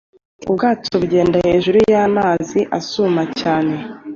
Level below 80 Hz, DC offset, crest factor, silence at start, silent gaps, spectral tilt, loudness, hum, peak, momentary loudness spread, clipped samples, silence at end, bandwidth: -46 dBFS; under 0.1%; 14 dB; 0.4 s; none; -6 dB/octave; -16 LUFS; none; -4 dBFS; 8 LU; under 0.1%; 0 s; 7.4 kHz